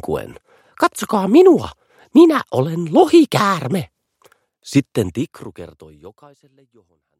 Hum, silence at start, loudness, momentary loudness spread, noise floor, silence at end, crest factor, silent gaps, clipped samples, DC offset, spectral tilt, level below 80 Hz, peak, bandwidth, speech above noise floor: none; 0.05 s; -15 LUFS; 19 LU; -56 dBFS; 1.1 s; 18 dB; none; under 0.1%; under 0.1%; -6.5 dB/octave; -52 dBFS; 0 dBFS; 15 kHz; 40 dB